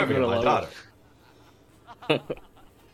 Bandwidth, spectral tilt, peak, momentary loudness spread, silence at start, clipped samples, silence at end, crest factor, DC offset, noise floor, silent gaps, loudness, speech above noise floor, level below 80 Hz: 15 kHz; -6 dB/octave; -6 dBFS; 17 LU; 0 s; under 0.1%; 0.6 s; 22 dB; under 0.1%; -56 dBFS; none; -25 LUFS; 31 dB; -58 dBFS